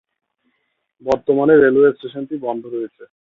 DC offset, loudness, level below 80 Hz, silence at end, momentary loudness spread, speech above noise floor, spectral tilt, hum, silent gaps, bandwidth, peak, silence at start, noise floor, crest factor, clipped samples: under 0.1%; -16 LUFS; -56 dBFS; 0.2 s; 17 LU; 54 dB; -8 dB/octave; none; none; 7 kHz; -2 dBFS; 1.05 s; -70 dBFS; 16 dB; under 0.1%